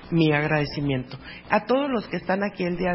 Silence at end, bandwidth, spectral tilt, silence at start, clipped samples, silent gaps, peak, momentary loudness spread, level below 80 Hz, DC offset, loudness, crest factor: 0 s; 5.8 kHz; -10.5 dB/octave; 0 s; under 0.1%; none; -4 dBFS; 8 LU; -50 dBFS; under 0.1%; -24 LUFS; 20 dB